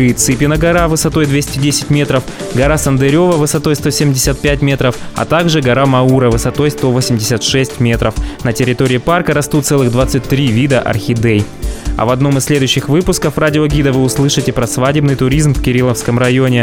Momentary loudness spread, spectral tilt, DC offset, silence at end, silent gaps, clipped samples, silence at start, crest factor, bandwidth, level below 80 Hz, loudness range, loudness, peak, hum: 4 LU; -5 dB/octave; 0.5%; 0 s; none; under 0.1%; 0 s; 10 dB; 17.5 kHz; -26 dBFS; 1 LU; -12 LUFS; 0 dBFS; none